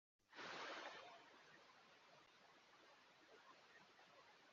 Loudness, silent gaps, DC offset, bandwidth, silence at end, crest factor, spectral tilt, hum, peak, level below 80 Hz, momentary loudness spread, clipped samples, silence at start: -60 LUFS; none; under 0.1%; 7.2 kHz; 0 s; 22 dB; 0.5 dB/octave; none; -40 dBFS; under -90 dBFS; 16 LU; under 0.1%; 0.2 s